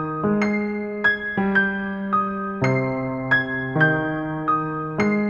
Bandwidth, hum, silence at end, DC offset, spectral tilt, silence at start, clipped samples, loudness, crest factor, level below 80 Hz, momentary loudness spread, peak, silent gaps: 7 kHz; none; 0 s; under 0.1%; -7.5 dB/octave; 0 s; under 0.1%; -22 LUFS; 18 dB; -52 dBFS; 6 LU; -4 dBFS; none